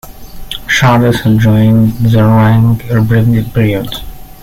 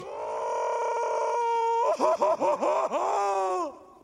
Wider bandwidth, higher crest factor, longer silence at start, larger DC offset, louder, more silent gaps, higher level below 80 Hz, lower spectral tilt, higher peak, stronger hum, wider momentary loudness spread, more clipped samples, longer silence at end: first, 15.5 kHz vs 11.5 kHz; second, 10 dB vs 18 dB; about the same, 0.05 s vs 0 s; neither; first, -9 LUFS vs -27 LUFS; neither; first, -30 dBFS vs -74 dBFS; first, -7 dB/octave vs -3 dB/octave; first, 0 dBFS vs -10 dBFS; neither; first, 11 LU vs 7 LU; neither; about the same, 0.15 s vs 0.2 s